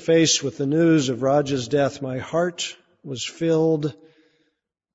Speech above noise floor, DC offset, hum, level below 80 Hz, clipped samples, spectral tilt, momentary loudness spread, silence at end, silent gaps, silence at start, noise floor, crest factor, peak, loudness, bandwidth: 53 dB; under 0.1%; none; -62 dBFS; under 0.1%; -4.5 dB/octave; 12 LU; 1 s; none; 0 s; -74 dBFS; 16 dB; -6 dBFS; -22 LUFS; 8 kHz